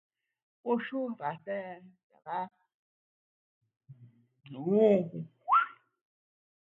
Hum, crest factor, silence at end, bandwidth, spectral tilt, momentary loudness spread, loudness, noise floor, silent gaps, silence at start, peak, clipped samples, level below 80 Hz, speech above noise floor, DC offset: none; 22 dB; 0.95 s; 4.1 kHz; -9 dB/octave; 19 LU; -31 LUFS; -57 dBFS; 2.03-2.10 s, 2.74-3.61 s; 0.65 s; -12 dBFS; under 0.1%; -84 dBFS; 26 dB; under 0.1%